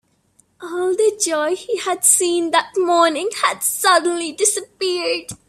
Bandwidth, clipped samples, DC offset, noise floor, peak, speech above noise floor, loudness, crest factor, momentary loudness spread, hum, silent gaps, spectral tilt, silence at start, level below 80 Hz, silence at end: 16 kHz; under 0.1%; under 0.1%; -59 dBFS; 0 dBFS; 41 dB; -17 LUFS; 18 dB; 9 LU; none; none; -0.5 dB/octave; 0.6 s; -64 dBFS; 0.15 s